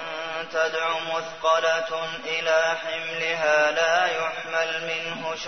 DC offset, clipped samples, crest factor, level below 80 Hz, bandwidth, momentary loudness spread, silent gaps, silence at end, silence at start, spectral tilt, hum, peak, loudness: 0.2%; under 0.1%; 16 dB; -66 dBFS; 6.6 kHz; 8 LU; none; 0 s; 0 s; -1.5 dB/octave; none; -8 dBFS; -24 LUFS